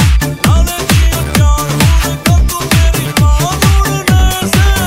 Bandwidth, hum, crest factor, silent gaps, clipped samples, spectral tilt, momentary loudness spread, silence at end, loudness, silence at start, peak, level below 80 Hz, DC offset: 16.5 kHz; none; 10 dB; none; under 0.1%; -4.5 dB/octave; 2 LU; 0 s; -11 LUFS; 0 s; 0 dBFS; -12 dBFS; 0.7%